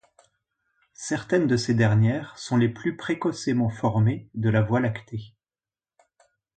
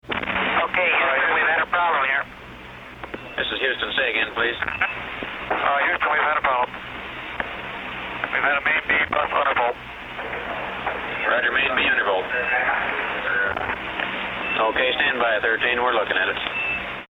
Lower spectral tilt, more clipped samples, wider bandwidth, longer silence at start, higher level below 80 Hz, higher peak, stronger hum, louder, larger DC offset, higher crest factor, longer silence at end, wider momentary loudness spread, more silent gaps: first, -6.5 dB/octave vs -5 dB/octave; neither; second, 9.2 kHz vs 19 kHz; first, 1 s vs 0.05 s; second, -56 dBFS vs -50 dBFS; second, -8 dBFS vs -4 dBFS; neither; second, -24 LUFS vs -21 LUFS; neither; about the same, 18 dB vs 18 dB; first, 1.3 s vs 0.05 s; about the same, 10 LU vs 12 LU; neither